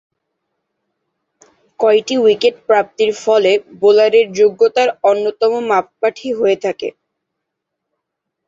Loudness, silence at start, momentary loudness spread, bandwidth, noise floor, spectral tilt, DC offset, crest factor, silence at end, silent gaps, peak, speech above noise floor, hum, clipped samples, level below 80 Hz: -14 LUFS; 1.8 s; 7 LU; 7.8 kHz; -77 dBFS; -4 dB/octave; under 0.1%; 14 dB; 1.6 s; none; -2 dBFS; 64 dB; none; under 0.1%; -64 dBFS